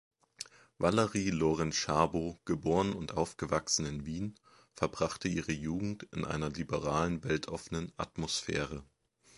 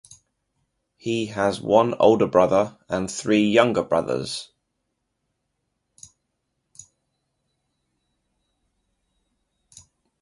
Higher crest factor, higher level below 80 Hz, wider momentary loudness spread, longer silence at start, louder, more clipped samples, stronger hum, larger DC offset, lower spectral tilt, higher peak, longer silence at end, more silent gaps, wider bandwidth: about the same, 24 dB vs 24 dB; about the same, -54 dBFS vs -58 dBFS; about the same, 10 LU vs 11 LU; second, 0.4 s vs 1.05 s; second, -34 LUFS vs -21 LUFS; neither; neither; neither; about the same, -4.5 dB/octave vs -5 dB/octave; second, -12 dBFS vs -2 dBFS; second, 0.55 s vs 5.75 s; neither; about the same, 11.5 kHz vs 11.5 kHz